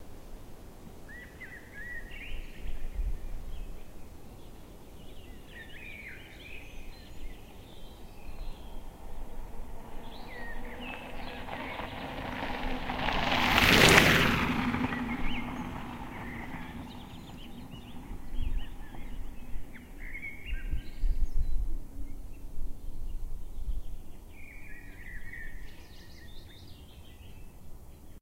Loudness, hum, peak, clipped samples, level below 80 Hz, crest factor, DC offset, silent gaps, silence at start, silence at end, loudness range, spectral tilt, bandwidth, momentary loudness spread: -30 LUFS; none; 0 dBFS; under 0.1%; -38 dBFS; 32 dB; under 0.1%; none; 0 s; 0.05 s; 23 LU; -3.5 dB/octave; 16 kHz; 21 LU